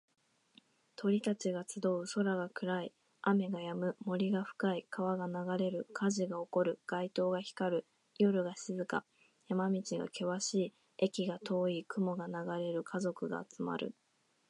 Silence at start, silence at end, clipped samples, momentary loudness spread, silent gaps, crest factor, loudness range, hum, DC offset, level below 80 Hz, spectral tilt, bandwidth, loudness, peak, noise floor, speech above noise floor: 1 s; 0.6 s; under 0.1%; 6 LU; none; 20 dB; 2 LU; none; under 0.1%; -86 dBFS; -5.5 dB/octave; 11 kHz; -37 LUFS; -16 dBFS; -68 dBFS; 32 dB